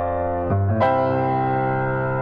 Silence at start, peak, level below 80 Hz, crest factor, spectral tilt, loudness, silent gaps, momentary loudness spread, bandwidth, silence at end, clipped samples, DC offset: 0 s; -8 dBFS; -46 dBFS; 12 dB; -10 dB/octave; -21 LUFS; none; 4 LU; 5 kHz; 0 s; under 0.1%; under 0.1%